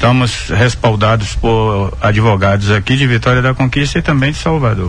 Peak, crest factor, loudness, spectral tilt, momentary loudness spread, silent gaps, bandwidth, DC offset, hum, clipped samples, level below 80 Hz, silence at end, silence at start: 0 dBFS; 10 dB; -12 LUFS; -6 dB/octave; 3 LU; none; 10 kHz; under 0.1%; none; under 0.1%; -26 dBFS; 0 s; 0 s